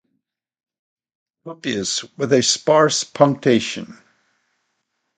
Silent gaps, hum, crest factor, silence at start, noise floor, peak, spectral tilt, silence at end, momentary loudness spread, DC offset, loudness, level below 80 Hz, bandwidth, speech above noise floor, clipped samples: none; none; 20 dB; 1.45 s; -75 dBFS; 0 dBFS; -3.5 dB/octave; 1.25 s; 15 LU; under 0.1%; -18 LUFS; -62 dBFS; 9.6 kHz; 56 dB; under 0.1%